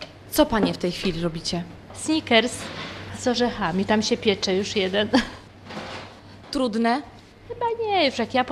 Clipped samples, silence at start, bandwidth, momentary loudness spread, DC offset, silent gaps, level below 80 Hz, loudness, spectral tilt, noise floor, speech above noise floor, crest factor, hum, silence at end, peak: under 0.1%; 0 s; 14.5 kHz; 16 LU; under 0.1%; none; -48 dBFS; -23 LUFS; -4 dB/octave; -43 dBFS; 20 dB; 20 dB; none; 0 s; -4 dBFS